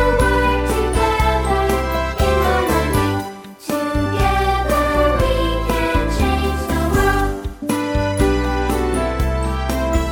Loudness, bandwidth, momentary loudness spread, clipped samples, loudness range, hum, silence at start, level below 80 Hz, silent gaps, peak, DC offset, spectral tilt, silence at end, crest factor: -18 LUFS; 18 kHz; 5 LU; under 0.1%; 2 LU; none; 0 s; -22 dBFS; none; -2 dBFS; under 0.1%; -5.5 dB/octave; 0 s; 14 dB